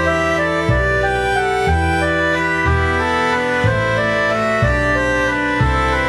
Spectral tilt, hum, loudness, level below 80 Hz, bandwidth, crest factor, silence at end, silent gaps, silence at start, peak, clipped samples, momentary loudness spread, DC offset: -5.5 dB/octave; none; -16 LUFS; -26 dBFS; 13.5 kHz; 14 dB; 0 s; none; 0 s; -2 dBFS; under 0.1%; 1 LU; under 0.1%